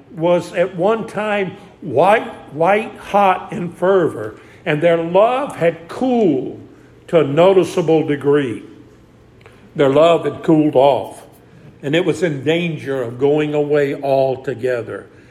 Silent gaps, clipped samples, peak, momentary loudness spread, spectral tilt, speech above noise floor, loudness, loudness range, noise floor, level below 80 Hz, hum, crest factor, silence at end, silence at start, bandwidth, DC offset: none; under 0.1%; 0 dBFS; 14 LU; -6.5 dB/octave; 30 dB; -16 LUFS; 2 LU; -46 dBFS; -56 dBFS; none; 16 dB; 0.25 s; 0.1 s; 13.5 kHz; under 0.1%